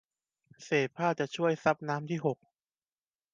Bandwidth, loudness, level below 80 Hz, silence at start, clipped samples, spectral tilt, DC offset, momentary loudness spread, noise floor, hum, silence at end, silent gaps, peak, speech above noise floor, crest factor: 9.2 kHz; -31 LUFS; -76 dBFS; 0.6 s; under 0.1%; -6 dB/octave; under 0.1%; 6 LU; under -90 dBFS; none; 1 s; none; -12 dBFS; over 59 dB; 22 dB